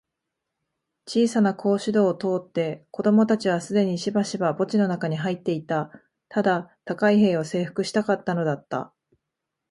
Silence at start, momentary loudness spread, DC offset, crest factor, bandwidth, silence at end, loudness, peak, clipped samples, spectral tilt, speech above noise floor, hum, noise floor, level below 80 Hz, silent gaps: 1.05 s; 9 LU; under 0.1%; 16 dB; 11.5 kHz; 0.85 s; -24 LUFS; -8 dBFS; under 0.1%; -6.5 dB/octave; 60 dB; none; -83 dBFS; -70 dBFS; none